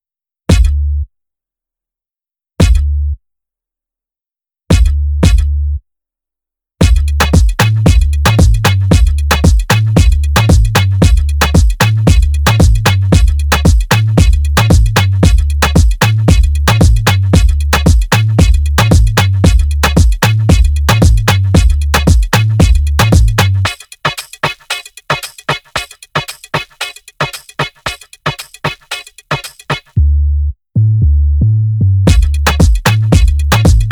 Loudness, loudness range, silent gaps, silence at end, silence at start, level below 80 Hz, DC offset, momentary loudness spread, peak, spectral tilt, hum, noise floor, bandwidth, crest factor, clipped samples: -11 LUFS; 9 LU; none; 0 s; 0.5 s; -12 dBFS; under 0.1%; 10 LU; 0 dBFS; -5.5 dB/octave; none; -90 dBFS; over 20 kHz; 10 dB; under 0.1%